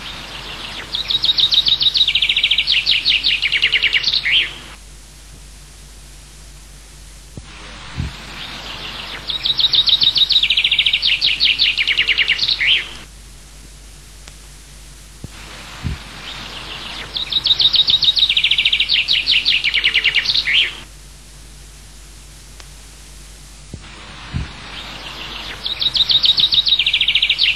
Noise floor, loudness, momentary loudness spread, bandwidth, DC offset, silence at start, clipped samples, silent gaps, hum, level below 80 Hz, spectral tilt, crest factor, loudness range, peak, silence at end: -39 dBFS; -13 LUFS; 19 LU; 16 kHz; 0.4%; 0 s; under 0.1%; none; none; -38 dBFS; -1 dB/octave; 16 dB; 20 LU; -2 dBFS; 0 s